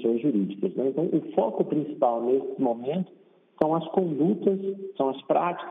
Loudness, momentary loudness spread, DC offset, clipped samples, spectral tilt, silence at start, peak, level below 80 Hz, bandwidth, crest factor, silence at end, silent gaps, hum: -26 LUFS; 5 LU; under 0.1%; under 0.1%; -10 dB/octave; 0 s; -6 dBFS; -74 dBFS; 3.8 kHz; 20 dB; 0 s; none; none